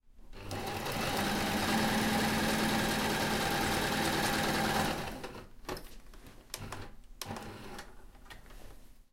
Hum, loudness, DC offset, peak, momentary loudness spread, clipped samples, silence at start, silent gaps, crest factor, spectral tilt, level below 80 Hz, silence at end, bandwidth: none; -32 LUFS; under 0.1%; -18 dBFS; 17 LU; under 0.1%; 0.05 s; none; 16 dB; -3.5 dB/octave; -50 dBFS; 0.1 s; 17 kHz